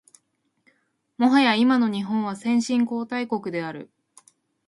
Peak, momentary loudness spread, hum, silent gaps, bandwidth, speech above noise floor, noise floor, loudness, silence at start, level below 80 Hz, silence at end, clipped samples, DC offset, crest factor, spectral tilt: -6 dBFS; 12 LU; none; none; 11.5 kHz; 49 dB; -71 dBFS; -22 LUFS; 1.2 s; -72 dBFS; 0.85 s; under 0.1%; under 0.1%; 18 dB; -5 dB/octave